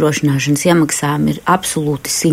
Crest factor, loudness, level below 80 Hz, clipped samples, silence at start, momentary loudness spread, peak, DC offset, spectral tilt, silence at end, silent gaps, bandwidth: 14 dB; -15 LUFS; -46 dBFS; under 0.1%; 0 s; 4 LU; -2 dBFS; under 0.1%; -4.5 dB/octave; 0 s; none; 16 kHz